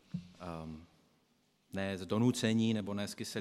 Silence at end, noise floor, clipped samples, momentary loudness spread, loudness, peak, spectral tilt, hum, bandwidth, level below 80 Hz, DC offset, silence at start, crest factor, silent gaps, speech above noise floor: 0 s; -74 dBFS; under 0.1%; 16 LU; -35 LUFS; -16 dBFS; -5.5 dB/octave; none; 14 kHz; -70 dBFS; under 0.1%; 0.15 s; 20 dB; none; 39 dB